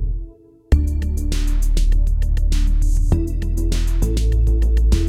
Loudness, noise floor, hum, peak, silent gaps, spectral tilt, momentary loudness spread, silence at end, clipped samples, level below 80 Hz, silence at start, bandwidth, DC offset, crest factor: -21 LUFS; -38 dBFS; none; -2 dBFS; none; -6.5 dB/octave; 5 LU; 0 s; under 0.1%; -16 dBFS; 0 s; 13.5 kHz; under 0.1%; 14 dB